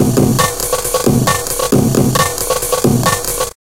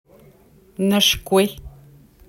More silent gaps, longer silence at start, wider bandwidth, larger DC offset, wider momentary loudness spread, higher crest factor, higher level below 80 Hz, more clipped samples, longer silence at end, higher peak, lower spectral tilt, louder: neither; second, 0 s vs 0.8 s; about the same, 17.5 kHz vs 16.5 kHz; first, 1% vs under 0.1%; second, 4 LU vs 22 LU; second, 14 dB vs 20 dB; first, -32 dBFS vs -44 dBFS; neither; second, 0.2 s vs 0.6 s; about the same, 0 dBFS vs -2 dBFS; about the same, -4.5 dB/octave vs -3.5 dB/octave; first, -13 LUFS vs -18 LUFS